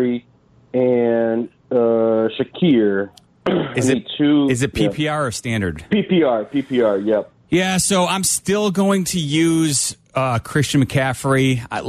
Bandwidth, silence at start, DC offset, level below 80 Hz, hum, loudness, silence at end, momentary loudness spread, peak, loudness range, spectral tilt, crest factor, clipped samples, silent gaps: 14 kHz; 0 s; under 0.1%; -48 dBFS; none; -18 LUFS; 0 s; 6 LU; -6 dBFS; 1 LU; -5 dB/octave; 12 dB; under 0.1%; none